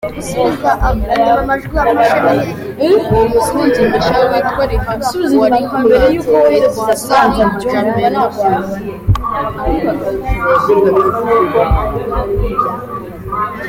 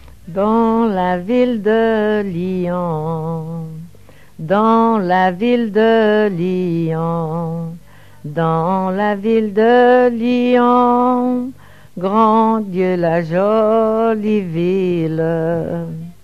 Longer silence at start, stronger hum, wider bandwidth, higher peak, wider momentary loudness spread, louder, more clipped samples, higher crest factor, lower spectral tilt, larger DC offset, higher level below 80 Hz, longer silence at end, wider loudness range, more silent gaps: about the same, 0 s vs 0.05 s; neither; first, 17 kHz vs 7.4 kHz; about the same, 0 dBFS vs 0 dBFS; second, 8 LU vs 12 LU; about the same, -13 LUFS vs -15 LUFS; neither; about the same, 12 dB vs 14 dB; second, -6 dB/octave vs -8.5 dB/octave; second, under 0.1% vs 0.8%; first, -26 dBFS vs -52 dBFS; about the same, 0 s vs 0.1 s; second, 2 LU vs 5 LU; neither